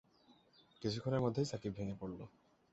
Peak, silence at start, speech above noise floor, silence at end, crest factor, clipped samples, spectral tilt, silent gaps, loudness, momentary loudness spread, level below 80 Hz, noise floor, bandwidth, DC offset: -22 dBFS; 0.3 s; 30 dB; 0.45 s; 20 dB; under 0.1%; -6.5 dB/octave; none; -40 LUFS; 13 LU; -66 dBFS; -69 dBFS; 8 kHz; under 0.1%